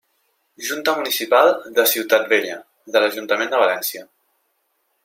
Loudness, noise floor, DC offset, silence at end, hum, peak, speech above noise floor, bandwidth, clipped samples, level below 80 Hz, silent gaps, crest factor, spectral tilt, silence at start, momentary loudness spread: -18 LUFS; -69 dBFS; under 0.1%; 1 s; none; -2 dBFS; 50 dB; 16.5 kHz; under 0.1%; -76 dBFS; none; 18 dB; -1 dB/octave; 0.6 s; 13 LU